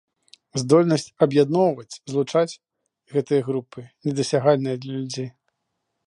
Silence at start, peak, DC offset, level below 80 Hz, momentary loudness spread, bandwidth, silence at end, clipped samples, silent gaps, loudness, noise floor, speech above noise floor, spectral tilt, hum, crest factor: 0.55 s; -4 dBFS; under 0.1%; -70 dBFS; 13 LU; 11.5 kHz; 0.75 s; under 0.1%; none; -22 LUFS; -77 dBFS; 56 dB; -6 dB/octave; none; 20 dB